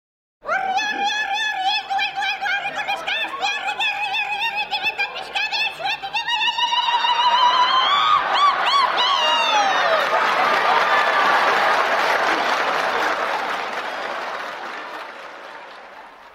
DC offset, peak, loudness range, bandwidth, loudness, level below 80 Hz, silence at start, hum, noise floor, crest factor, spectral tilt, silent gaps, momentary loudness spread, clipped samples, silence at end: under 0.1%; -4 dBFS; 6 LU; 16 kHz; -19 LUFS; -64 dBFS; 0.45 s; none; -41 dBFS; 16 dB; -0.5 dB/octave; none; 12 LU; under 0.1%; 0.05 s